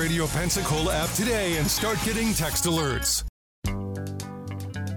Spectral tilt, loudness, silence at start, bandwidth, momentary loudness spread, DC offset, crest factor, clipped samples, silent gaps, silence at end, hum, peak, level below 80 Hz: -3.5 dB/octave; -26 LUFS; 0 s; over 20 kHz; 11 LU; under 0.1%; 12 dB; under 0.1%; 3.29-3.62 s; 0 s; none; -14 dBFS; -38 dBFS